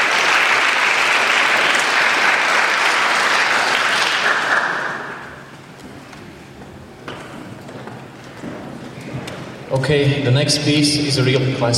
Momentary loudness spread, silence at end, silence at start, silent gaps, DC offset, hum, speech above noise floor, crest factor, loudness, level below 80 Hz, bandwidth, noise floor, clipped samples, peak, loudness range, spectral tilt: 21 LU; 0 s; 0 s; none; under 0.1%; none; 22 dB; 18 dB; -15 LUFS; -54 dBFS; 16.5 kHz; -37 dBFS; under 0.1%; 0 dBFS; 20 LU; -3.5 dB/octave